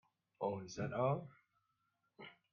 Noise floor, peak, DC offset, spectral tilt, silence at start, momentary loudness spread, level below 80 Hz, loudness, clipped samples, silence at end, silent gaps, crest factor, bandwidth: -84 dBFS; -24 dBFS; under 0.1%; -6.5 dB/octave; 0.4 s; 20 LU; -76 dBFS; -41 LUFS; under 0.1%; 0.2 s; none; 20 dB; 7.2 kHz